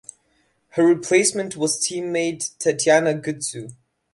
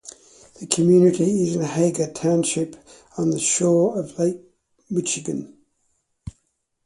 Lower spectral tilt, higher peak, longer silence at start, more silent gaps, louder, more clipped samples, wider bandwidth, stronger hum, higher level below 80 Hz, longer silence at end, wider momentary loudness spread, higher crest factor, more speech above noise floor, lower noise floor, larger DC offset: second, -3.5 dB/octave vs -5 dB/octave; second, -4 dBFS vs 0 dBFS; first, 0.75 s vs 0.05 s; neither; about the same, -20 LUFS vs -21 LUFS; neither; about the same, 11.5 kHz vs 11.5 kHz; neither; second, -66 dBFS vs -56 dBFS; second, 0.4 s vs 0.55 s; second, 12 LU vs 24 LU; about the same, 18 dB vs 22 dB; second, 45 dB vs 51 dB; second, -65 dBFS vs -71 dBFS; neither